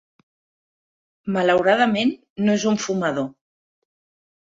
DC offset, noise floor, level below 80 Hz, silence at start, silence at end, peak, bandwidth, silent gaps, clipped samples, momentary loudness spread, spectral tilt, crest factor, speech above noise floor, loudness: under 0.1%; under -90 dBFS; -64 dBFS; 1.25 s; 1.1 s; -6 dBFS; 7.8 kHz; 2.30-2.36 s; under 0.1%; 10 LU; -5 dB/octave; 18 dB; over 70 dB; -20 LUFS